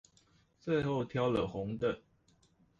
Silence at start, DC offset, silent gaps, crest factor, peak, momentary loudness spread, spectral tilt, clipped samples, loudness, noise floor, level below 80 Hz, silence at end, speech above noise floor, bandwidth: 0.65 s; under 0.1%; none; 16 dB; -20 dBFS; 8 LU; -7.5 dB/octave; under 0.1%; -35 LUFS; -70 dBFS; -60 dBFS; 0.8 s; 36 dB; 7.8 kHz